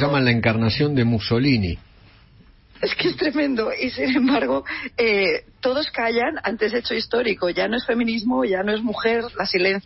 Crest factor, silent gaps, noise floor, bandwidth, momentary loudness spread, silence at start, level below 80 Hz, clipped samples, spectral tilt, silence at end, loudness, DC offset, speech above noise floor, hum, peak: 16 dB; none; -51 dBFS; 6 kHz; 5 LU; 0 s; -46 dBFS; under 0.1%; -9 dB/octave; 0.05 s; -21 LUFS; under 0.1%; 30 dB; none; -6 dBFS